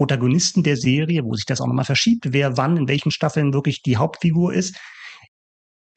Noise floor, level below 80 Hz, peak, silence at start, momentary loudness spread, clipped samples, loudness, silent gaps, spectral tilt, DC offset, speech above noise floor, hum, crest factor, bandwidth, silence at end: under -90 dBFS; -54 dBFS; -6 dBFS; 0 s; 7 LU; under 0.1%; -19 LUFS; none; -5.5 dB/octave; under 0.1%; over 71 dB; none; 14 dB; 8.8 kHz; 0.8 s